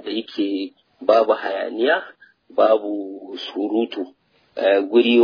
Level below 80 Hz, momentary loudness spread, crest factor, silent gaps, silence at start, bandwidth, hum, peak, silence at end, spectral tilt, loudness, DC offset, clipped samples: -78 dBFS; 15 LU; 20 dB; none; 0.05 s; 5.2 kHz; none; -2 dBFS; 0 s; -5.5 dB/octave; -20 LUFS; under 0.1%; under 0.1%